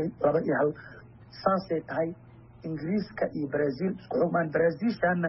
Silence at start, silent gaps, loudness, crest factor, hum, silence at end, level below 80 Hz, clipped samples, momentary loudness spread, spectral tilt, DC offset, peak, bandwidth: 0 s; none; -29 LUFS; 18 dB; none; 0 s; -60 dBFS; under 0.1%; 14 LU; -6.5 dB/octave; under 0.1%; -10 dBFS; 5.8 kHz